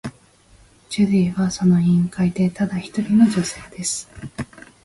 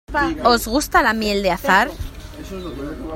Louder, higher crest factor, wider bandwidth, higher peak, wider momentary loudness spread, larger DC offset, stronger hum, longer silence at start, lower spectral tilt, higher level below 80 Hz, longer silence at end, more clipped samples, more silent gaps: about the same, -19 LUFS vs -17 LUFS; about the same, 16 dB vs 20 dB; second, 11.5 kHz vs 16.5 kHz; second, -4 dBFS vs 0 dBFS; about the same, 17 LU vs 17 LU; neither; neither; about the same, 0.05 s vs 0.1 s; first, -6 dB/octave vs -4 dB/octave; second, -50 dBFS vs -34 dBFS; first, 0.4 s vs 0 s; neither; neither